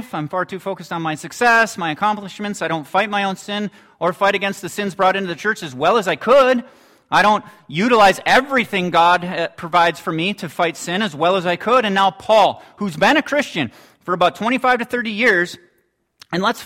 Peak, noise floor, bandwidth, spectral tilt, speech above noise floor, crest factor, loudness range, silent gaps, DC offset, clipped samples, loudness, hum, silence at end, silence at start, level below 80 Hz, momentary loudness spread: -2 dBFS; -64 dBFS; 16.5 kHz; -4.5 dB/octave; 47 dB; 16 dB; 4 LU; none; under 0.1%; under 0.1%; -17 LUFS; none; 0 s; 0 s; -56 dBFS; 11 LU